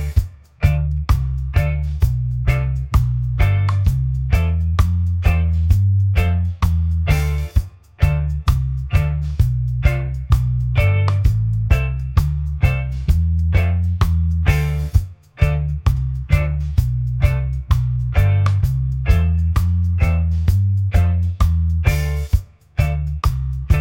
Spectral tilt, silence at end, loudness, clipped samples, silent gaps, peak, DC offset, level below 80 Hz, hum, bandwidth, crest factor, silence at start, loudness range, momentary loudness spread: -7.5 dB/octave; 0 s; -19 LUFS; under 0.1%; none; -2 dBFS; under 0.1%; -22 dBFS; none; 16.5 kHz; 14 dB; 0 s; 2 LU; 5 LU